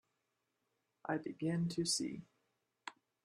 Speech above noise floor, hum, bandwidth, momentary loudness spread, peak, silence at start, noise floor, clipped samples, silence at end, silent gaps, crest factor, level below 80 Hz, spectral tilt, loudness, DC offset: 47 dB; none; 13 kHz; 18 LU; -24 dBFS; 1.05 s; -85 dBFS; under 0.1%; 0.35 s; none; 20 dB; -78 dBFS; -4 dB/octave; -39 LUFS; under 0.1%